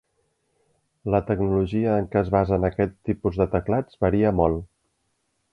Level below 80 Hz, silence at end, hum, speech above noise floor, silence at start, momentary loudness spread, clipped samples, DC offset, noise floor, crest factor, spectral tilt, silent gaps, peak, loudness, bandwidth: -40 dBFS; 0.85 s; none; 50 dB; 1.05 s; 6 LU; under 0.1%; under 0.1%; -72 dBFS; 20 dB; -10.5 dB/octave; none; -4 dBFS; -23 LUFS; 5.6 kHz